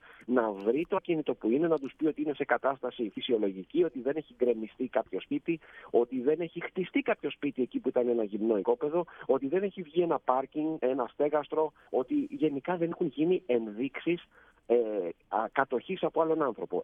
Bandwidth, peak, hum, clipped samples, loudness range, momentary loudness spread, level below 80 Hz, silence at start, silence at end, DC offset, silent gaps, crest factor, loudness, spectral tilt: 3.8 kHz; -10 dBFS; none; under 0.1%; 2 LU; 5 LU; -72 dBFS; 0.2 s; 0 s; under 0.1%; none; 20 dB; -31 LUFS; -9 dB/octave